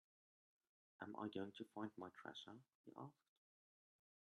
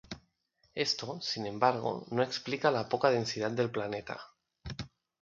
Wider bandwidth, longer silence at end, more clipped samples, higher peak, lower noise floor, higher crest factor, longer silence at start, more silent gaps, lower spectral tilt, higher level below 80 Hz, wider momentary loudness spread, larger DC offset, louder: first, 11 kHz vs 7.6 kHz; first, 1.25 s vs 0.35 s; neither; second, -34 dBFS vs -10 dBFS; first, under -90 dBFS vs -73 dBFS; about the same, 22 dB vs 22 dB; first, 1 s vs 0.1 s; first, 2.75-2.84 s vs none; first, -6 dB/octave vs -4.5 dB/octave; second, under -90 dBFS vs -62 dBFS; second, 11 LU vs 16 LU; neither; second, -55 LUFS vs -32 LUFS